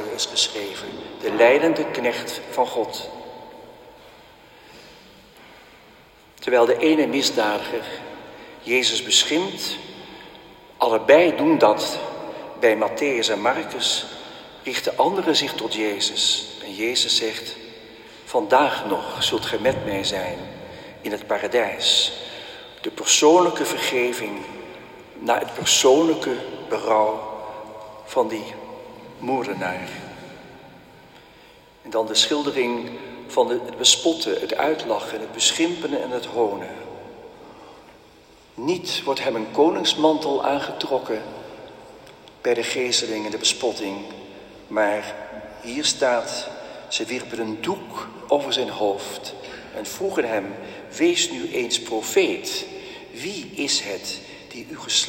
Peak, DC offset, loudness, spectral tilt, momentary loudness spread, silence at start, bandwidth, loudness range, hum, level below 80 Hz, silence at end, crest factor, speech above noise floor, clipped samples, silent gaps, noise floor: 0 dBFS; under 0.1%; -21 LUFS; -2 dB/octave; 20 LU; 0 s; 16.5 kHz; 7 LU; none; -60 dBFS; 0 s; 22 dB; 29 dB; under 0.1%; none; -50 dBFS